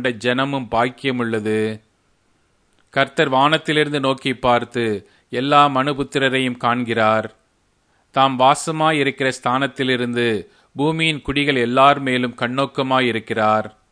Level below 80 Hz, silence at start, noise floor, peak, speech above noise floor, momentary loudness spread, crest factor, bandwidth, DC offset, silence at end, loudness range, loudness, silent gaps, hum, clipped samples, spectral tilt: -50 dBFS; 0 s; -63 dBFS; 0 dBFS; 44 dB; 8 LU; 20 dB; 11 kHz; under 0.1%; 0.25 s; 2 LU; -18 LUFS; none; none; under 0.1%; -5 dB/octave